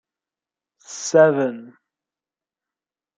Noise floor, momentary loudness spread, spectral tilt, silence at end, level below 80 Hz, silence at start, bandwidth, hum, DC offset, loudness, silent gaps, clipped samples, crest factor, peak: under -90 dBFS; 22 LU; -4.5 dB/octave; 1.5 s; -76 dBFS; 0.9 s; 9.2 kHz; none; under 0.1%; -18 LUFS; none; under 0.1%; 20 dB; -2 dBFS